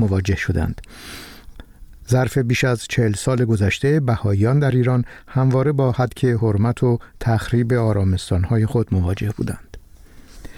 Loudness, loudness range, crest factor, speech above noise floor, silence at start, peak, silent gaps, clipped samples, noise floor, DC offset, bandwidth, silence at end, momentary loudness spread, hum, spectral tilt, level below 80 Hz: -19 LUFS; 3 LU; 12 dB; 25 dB; 0 s; -6 dBFS; none; under 0.1%; -43 dBFS; under 0.1%; 14 kHz; 0 s; 10 LU; none; -7 dB/octave; -38 dBFS